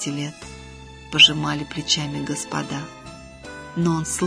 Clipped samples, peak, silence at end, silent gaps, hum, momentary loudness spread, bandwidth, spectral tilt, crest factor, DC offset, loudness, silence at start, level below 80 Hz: under 0.1%; -2 dBFS; 0 s; none; none; 27 LU; 11 kHz; -3 dB/octave; 22 dB; under 0.1%; -20 LUFS; 0 s; -48 dBFS